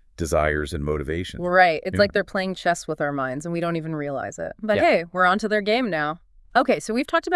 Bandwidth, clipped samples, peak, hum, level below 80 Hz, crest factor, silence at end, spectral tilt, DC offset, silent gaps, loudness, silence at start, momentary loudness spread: 12 kHz; under 0.1%; -4 dBFS; none; -44 dBFS; 20 dB; 0 s; -5 dB/octave; under 0.1%; none; -23 LUFS; 0.2 s; 9 LU